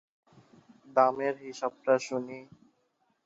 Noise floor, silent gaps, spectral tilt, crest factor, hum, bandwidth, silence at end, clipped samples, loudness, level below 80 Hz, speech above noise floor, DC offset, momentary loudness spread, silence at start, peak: -74 dBFS; none; -4.5 dB/octave; 22 dB; none; 8 kHz; 0.8 s; under 0.1%; -29 LUFS; -82 dBFS; 45 dB; under 0.1%; 13 LU; 0.9 s; -10 dBFS